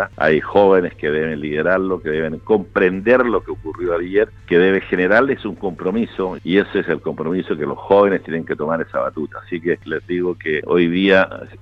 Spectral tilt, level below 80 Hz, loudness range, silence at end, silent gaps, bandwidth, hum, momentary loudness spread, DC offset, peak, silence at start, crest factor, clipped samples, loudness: -8 dB/octave; -46 dBFS; 3 LU; 0.05 s; none; 6.2 kHz; none; 9 LU; under 0.1%; 0 dBFS; 0 s; 18 dB; under 0.1%; -18 LUFS